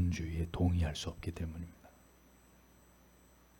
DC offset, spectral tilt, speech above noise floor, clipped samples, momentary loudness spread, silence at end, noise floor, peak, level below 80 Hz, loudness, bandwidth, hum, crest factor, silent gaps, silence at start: under 0.1%; -6.5 dB/octave; 27 dB; under 0.1%; 13 LU; 1.7 s; -63 dBFS; -20 dBFS; -50 dBFS; -37 LUFS; 18 kHz; none; 18 dB; none; 0 s